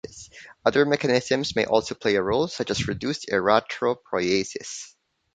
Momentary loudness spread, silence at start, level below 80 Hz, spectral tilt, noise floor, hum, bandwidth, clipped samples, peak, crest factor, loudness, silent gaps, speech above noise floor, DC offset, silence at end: 15 LU; 0.05 s; -54 dBFS; -4.5 dB/octave; -46 dBFS; none; 9.4 kHz; under 0.1%; -2 dBFS; 22 dB; -24 LUFS; none; 22 dB; under 0.1%; 0.45 s